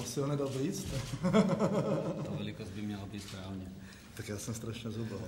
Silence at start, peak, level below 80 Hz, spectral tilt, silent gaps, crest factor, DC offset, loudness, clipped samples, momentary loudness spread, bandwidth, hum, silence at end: 0 s; -14 dBFS; -58 dBFS; -6 dB/octave; none; 20 dB; under 0.1%; -35 LUFS; under 0.1%; 14 LU; 16 kHz; none; 0 s